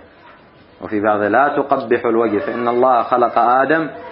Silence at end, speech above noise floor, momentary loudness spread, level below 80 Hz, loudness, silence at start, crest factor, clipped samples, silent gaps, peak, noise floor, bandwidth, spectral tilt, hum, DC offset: 0 s; 30 dB; 5 LU; -60 dBFS; -16 LUFS; 0.8 s; 16 dB; under 0.1%; none; 0 dBFS; -45 dBFS; 5.4 kHz; -11 dB/octave; none; under 0.1%